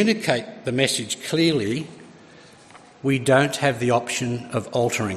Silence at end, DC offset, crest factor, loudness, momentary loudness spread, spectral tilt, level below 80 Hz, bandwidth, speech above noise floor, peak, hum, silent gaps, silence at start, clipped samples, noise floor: 0 s; under 0.1%; 20 dB; -22 LUFS; 9 LU; -4.5 dB/octave; -62 dBFS; 14 kHz; 26 dB; -4 dBFS; none; none; 0 s; under 0.1%; -48 dBFS